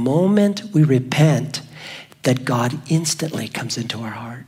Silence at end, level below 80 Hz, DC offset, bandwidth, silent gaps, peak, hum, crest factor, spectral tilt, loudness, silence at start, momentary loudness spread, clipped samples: 0.05 s; -60 dBFS; under 0.1%; 16 kHz; none; -4 dBFS; none; 16 dB; -5.5 dB/octave; -19 LUFS; 0 s; 13 LU; under 0.1%